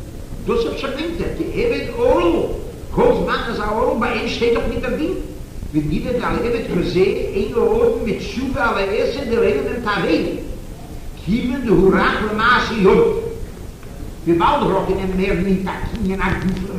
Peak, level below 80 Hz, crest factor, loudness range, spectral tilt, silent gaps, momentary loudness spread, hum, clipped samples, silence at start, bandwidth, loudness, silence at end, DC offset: -2 dBFS; -30 dBFS; 16 dB; 3 LU; -6.5 dB/octave; none; 14 LU; none; under 0.1%; 0 s; 15.5 kHz; -18 LUFS; 0 s; 0.2%